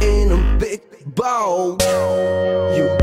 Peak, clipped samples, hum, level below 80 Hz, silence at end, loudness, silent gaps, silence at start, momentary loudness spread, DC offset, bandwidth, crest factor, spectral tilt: -4 dBFS; under 0.1%; none; -22 dBFS; 0 s; -18 LUFS; none; 0 s; 7 LU; under 0.1%; 15.5 kHz; 14 dB; -5.5 dB/octave